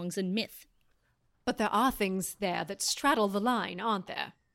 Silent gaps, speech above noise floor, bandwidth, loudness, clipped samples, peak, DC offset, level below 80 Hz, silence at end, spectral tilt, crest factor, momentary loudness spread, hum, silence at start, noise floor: none; 41 dB; 16.5 kHz; -31 LUFS; under 0.1%; -16 dBFS; under 0.1%; -60 dBFS; 0.25 s; -3.5 dB/octave; 16 dB; 10 LU; none; 0 s; -72 dBFS